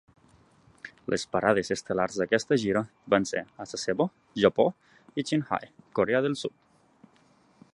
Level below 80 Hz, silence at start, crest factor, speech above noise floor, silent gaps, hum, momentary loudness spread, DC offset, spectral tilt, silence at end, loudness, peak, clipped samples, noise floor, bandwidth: -62 dBFS; 0.85 s; 24 dB; 35 dB; none; none; 11 LU; under 0.1%; -5 dB/octave; 1.25 s; -28 LUFS; -6 dBFS; under 0.1%; -62 dBFS; 11.5 kHz